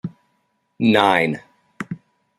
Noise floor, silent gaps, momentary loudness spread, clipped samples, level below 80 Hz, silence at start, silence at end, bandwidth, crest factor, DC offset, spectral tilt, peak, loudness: -68 dBFS; none; 20 LU; under 0.1%; -64 dBFS; 0.05 s; 0.45 s; 14.5 kHz; 20 dB; under 0.1%; -6 dB/octave; -2 dBFS; -17 LUFS